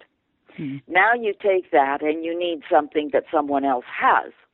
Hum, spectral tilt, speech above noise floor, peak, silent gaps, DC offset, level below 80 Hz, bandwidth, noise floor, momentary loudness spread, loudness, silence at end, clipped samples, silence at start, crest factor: none; -8.5 dB/octave; 37 dB; -4 dBFS; none; under 0.1%; -68 dBFS; 4.1 kHz; -58 dBFS; 7 LU; -21 LUFS; 0.25 s; under 0.1%; 0.6 s; 18 dB